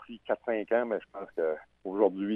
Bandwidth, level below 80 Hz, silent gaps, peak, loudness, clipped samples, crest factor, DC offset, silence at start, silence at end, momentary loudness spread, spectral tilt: 4 kHz; -72 dBFS; none; -12 dBFS; -32 LUFS; under 0.1%; 20 dB; under 0.1%; 0 s; 0 s; 10 LU; -8.5 dB/octave